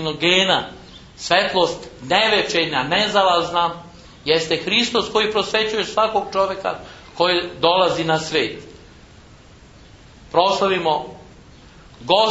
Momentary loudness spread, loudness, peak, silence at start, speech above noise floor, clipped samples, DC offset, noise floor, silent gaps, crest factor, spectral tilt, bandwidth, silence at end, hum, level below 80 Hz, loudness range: 12 LU; -18 LUFS; 0 dBFS; 0 s; 27 dB; under 0.1%; under 0.1%; -45 dBFS; none; 20 dB; -3.5 dB/octave; 8 kHz; 0 s; none; -50 dBFS; 5 LU